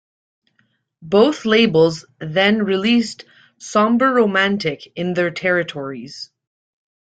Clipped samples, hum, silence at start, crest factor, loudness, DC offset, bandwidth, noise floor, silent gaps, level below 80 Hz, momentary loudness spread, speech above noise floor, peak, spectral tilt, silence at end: under 0.1%; none; 1 s; 18 dB; -17 LUFS; under 0.1%; 9 kHz; -65 dBFS; none; -60 dBFS; 16 LU; 47 dB; -2 dBFS; -5 dB/octave; 0.75 s